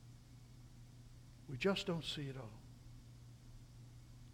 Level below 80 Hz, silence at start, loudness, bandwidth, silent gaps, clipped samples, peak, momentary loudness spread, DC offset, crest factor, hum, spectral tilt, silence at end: -64 dBFS; 0 s; -42 LUFS; 16.5 kHz; none; under 0.1%; -24 dBFS; 22 LU; under 0.1%; 22 dB; none; -5.5 dB/octave; 0 s